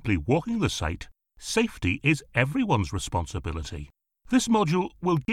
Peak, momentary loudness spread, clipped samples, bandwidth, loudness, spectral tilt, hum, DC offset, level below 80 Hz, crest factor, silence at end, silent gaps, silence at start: -8 dBFS; 15 LU; under 0.1%; 15.5 kHz; -26 LUFS; -5.5 dB/octave; none; under 0.1%; -42 dBFS; 18 dB; 0 s; none; 0.05 s